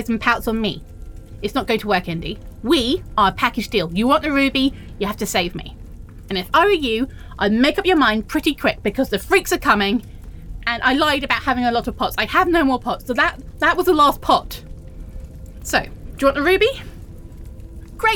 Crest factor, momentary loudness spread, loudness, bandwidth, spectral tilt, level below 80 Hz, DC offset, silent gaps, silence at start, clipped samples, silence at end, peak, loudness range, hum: 18 dB; 22 LU; -19 LUFS; over 20 kHz; -4.5 dB/octave; -36 dBFS; under 0.1%; none; 0 s; under 0.1%; 0 s; -2 dBFS; 3 LU; none